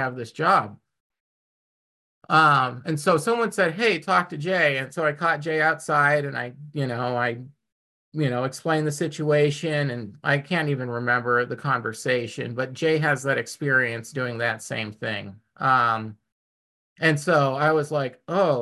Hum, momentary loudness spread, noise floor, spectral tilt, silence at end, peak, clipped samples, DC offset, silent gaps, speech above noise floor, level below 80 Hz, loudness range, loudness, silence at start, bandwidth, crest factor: none; 10 LU; under -90 dBFS; -5.5 dB/octave; 0 s; -6 dBFS; under 0.1%; under 0.1%; 1.00-1.10 s, 1.20-2.21 s, 7.72-8.12 s, 16.32-16.96 s; over 67 dB; -68 dBFS; 4 LU; -23 LUFS; 0 s; 12.5 kHz; 18 dB